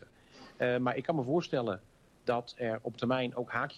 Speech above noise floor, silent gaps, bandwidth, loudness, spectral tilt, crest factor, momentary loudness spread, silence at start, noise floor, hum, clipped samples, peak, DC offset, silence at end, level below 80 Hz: 23 dB; none; 11 kHz; -34 LUFS; -7 dB/octave; 16 dB; 6 LU; 0 s; -56 dBFS; none; under 0.1%; -18 dBFS; under 0.1%; 0 s; -68 dBFS